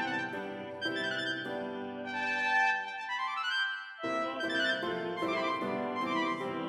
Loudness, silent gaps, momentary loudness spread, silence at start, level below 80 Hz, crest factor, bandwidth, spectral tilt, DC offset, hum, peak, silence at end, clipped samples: -33 LUFS; none; 9 LU; 0 s; -76 dBFS; 16 dB; 13.5 kHz; -4 dB/octave; under 0.1%; none; -18 dBFS; 0 s; under 0.1%